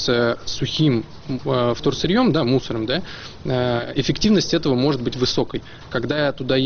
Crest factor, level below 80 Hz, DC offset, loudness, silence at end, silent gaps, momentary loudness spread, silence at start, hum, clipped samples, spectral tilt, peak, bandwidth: 14 dB; -42 dBFS; under 0.1%; -21 LUFS; 0 s; none; 10 LU; 0 s; none; under 0.1%; -4.5 dB/octave; -6 dBFS; 6.8 kHz